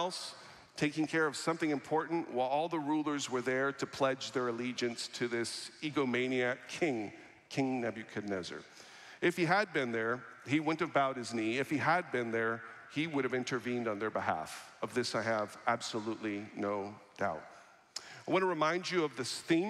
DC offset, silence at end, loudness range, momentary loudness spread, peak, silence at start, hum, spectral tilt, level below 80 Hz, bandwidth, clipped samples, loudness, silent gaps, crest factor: under 0.1%; 0 s; 3 LU; 11 LU; -16 dBFS; 0 s; none; -4.5 dB/octave; -80 dBFS; 14 kHz; under 0.1%; -35 LUFS; none; 20 dB